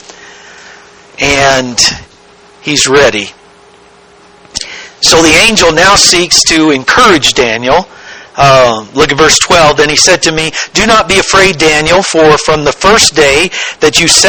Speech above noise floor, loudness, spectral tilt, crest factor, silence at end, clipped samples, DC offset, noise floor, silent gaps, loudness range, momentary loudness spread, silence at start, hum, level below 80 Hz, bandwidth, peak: 32 dB; -6 LUFS; -2 dB/octave; 8 dB; 0 s; 2%; 0.5%; -39 dBFS; none; 5 LU; 9 LU; 0.7 s; none; -32 dBFS; over 20 kHz; 0 dBFS